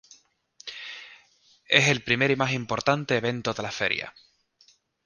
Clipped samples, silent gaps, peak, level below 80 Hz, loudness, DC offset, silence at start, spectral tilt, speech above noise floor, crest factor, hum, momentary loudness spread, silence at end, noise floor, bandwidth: under 0.1%; none; -2 dBFS; -60 dBFS; -24 LUFS; under 0.1%; 0.65 s; -4 dB/octave; 37 dB; 26 dB; none; 20 LU; 0.95 s; -62 dBFS; 10 kHz